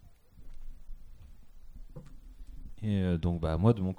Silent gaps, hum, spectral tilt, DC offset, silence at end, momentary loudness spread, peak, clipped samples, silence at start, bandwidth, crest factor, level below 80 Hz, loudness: none; none; -9.5 dB/octave; under 0.1%; 0 s; 27 LU; -10 dBFS; under 0.1%; 0.05 s; 10 kHz; 22 dB; -44 dBFS; -30 LUFS